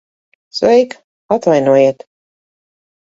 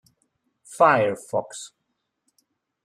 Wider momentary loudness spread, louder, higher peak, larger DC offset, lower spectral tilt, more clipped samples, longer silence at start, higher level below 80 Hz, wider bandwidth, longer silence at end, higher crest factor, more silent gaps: second, 13 LU vs 24 LU; first, -13 LUFS vs -21 LUFS; first, 0 dBFS vs -4 dBFS; neither; first, -6 dB/octave vs -4.5 dB/octave; neither; second, 0.55 s vs 0.7 s; first, -60 dBFS vs -70 dBFS; second, 7.8 kHz vs 13.5 kHz; about the same, 1.15 s vs 1.2 s; second, 16 dB vs 22 dB; first, 1.04-1.29 s vs none